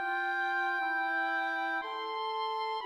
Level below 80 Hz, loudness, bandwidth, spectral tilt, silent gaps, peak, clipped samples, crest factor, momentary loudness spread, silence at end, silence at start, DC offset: -86 dBFS; -32 LUFS; 13.5 kHz; -1 dB/octave; none; -22 dBFS; under 0.1%; 10 dB; 4 LU; 0 s; 0 s; under 0.1%